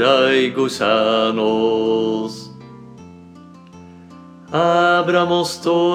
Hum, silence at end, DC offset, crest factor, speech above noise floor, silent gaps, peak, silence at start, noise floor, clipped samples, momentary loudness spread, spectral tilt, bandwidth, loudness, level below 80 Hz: none; 0 s; under 0.1%; 16 dB; 25 dB; none; -2 dBFS; 0 s; -41 dBFS; under 0.1%; 10 LU; -5 dB/octave; 14.5 kHz; -17 LUFS; -62 dBFS